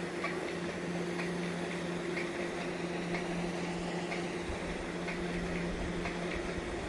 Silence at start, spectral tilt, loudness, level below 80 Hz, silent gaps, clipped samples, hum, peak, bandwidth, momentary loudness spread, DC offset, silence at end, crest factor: 0 s; -5.5 dB/octave; -37 LUFS; -52 dBFS; none; under 0.1%; none; -22 dBFS; 11.5 kHz; 2 LU; under 0.1%; 0 s; 14 dB